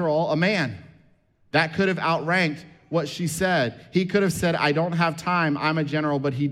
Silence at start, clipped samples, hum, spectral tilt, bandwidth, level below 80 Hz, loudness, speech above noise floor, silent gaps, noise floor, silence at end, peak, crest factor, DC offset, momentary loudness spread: 0 s; under 0.1%; none; -5.5 dB/octave; 15 kHz; -56 dBFS; -23 LUFS; 37 dB; none; -60 dBFS; 0 s; -8 dBFS; 16 dB; under 0.1%; 6 LU